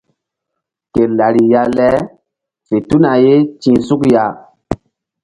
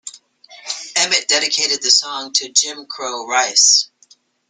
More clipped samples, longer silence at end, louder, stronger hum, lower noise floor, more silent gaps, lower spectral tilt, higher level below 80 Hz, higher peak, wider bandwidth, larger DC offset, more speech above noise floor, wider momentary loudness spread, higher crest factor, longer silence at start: neither; second, 0.5 s vs 0.65 s; about the same, -12 LUFS vs -14 LUFS; neither; first, -77 dBFS vs -53 dBFS; neither; first, -8 dB/octave vs 2.5 dB/octave; first, -44 dBFS vs -74 dBFS; about the same, 0 dBFS vs 0 dBFS; about the same, 11 kHz vs 12 kHz; neither; first, 66 dB vs 36 dB; about the same, 15 LU vs 16 LU; about the same, 14 dB vs 18 dB; first, 0.95 s vs 0.05 s